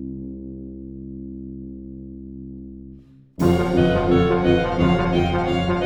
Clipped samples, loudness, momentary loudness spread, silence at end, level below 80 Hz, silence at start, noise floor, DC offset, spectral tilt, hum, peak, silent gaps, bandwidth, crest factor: under 0.1%; -19 LUFS; 19 LU; 0 s; -36 dBFS; 0 s; -45 dBFS; under 0.1%; -7.5 dB/octave; none; -4 dBFS; none; 15.5 kHz; 18 dB